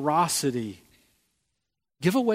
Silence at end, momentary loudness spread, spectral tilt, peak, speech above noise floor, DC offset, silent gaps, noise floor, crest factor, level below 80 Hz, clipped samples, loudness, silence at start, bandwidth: 0 s; 11 LU; -4.5 dB/octave; -8 dBFS; 58 dB; under 0.1%; none; -83 dBFS; 20 dB; -68 dBFS; under 0.1%; -26 LUFS; 0 s; 16 kHz